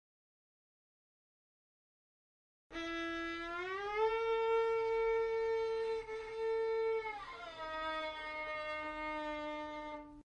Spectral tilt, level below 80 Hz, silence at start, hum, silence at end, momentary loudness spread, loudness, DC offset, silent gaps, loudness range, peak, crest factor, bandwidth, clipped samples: -4 dB/octave; -64 dBFS; 2.7 s; none; 0.1 s; 11 LU; -38 LUFS; under 0.1%; none; 9 LU; -24 dBFS; 16 dB; 9 kHz; under 0.1%